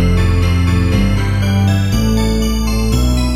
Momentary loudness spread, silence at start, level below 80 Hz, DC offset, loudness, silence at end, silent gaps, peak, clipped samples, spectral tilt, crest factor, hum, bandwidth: 2 LU; 0 s; -18 dBFS; under 0.1%; -14 LUFS; 0 s; none; -2 dBFS; under 0.1%; -6 dB/octave; 12 dB; none; 15.5 kHz